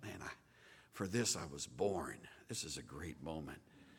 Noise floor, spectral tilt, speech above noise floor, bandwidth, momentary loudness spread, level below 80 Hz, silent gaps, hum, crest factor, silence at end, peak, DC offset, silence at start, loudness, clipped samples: -65 dBFS; -3.5 dB/octave; 22 dB; 18 kHz; 19 LU; -66 dBFS; none; none; 24 dB; 0 s; -20 dBFS; under 0.1%; 0 s; -43 LUFS; under 0.1%